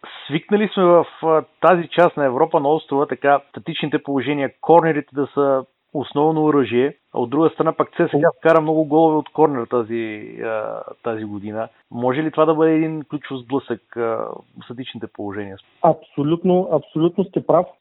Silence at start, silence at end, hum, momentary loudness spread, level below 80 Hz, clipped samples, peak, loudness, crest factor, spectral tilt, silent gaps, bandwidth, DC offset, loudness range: 0.05 s; 0.1 s; none; 14 LU; -68 dBFS; under 0.1%; 0 dBFS; -19 LUFS; 18 dB; -9 dB/octave; none; 4.1 kHz; under 0.1%; 6 LU